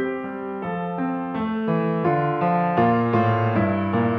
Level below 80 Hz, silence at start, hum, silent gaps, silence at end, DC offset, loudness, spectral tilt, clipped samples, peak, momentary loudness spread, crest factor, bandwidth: -58 dBFS; 0 s; none; none; 0 s; under 0.1%; -22 LUFS; -10 dB/octave; under 0.1%; -6 dBFS; 9 LU; 16 dB; 5.8 kHz